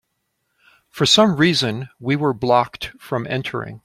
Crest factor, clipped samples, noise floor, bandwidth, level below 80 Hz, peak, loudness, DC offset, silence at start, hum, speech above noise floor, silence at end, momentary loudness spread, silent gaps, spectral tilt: 18 dB; under 0.1%; -73 dBFS; 15.5 kHz; -54 dBFS; -2 dBFS; -18 LUFS; under 0.1%; 0.95 s; none; 54 dB; 0.05 s; 13 LU; none; -4.5 dB/octave